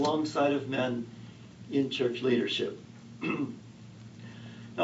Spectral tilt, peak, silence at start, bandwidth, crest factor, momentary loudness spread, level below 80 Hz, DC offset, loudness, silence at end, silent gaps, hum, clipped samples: -5.5 dB/octave; -14 dBFS; 0 s; 8 kHz; 18 dB; 21 LU; -72 dBFS; under 0.1%; -31 LUFS; 0 s; none; none; under 0.1%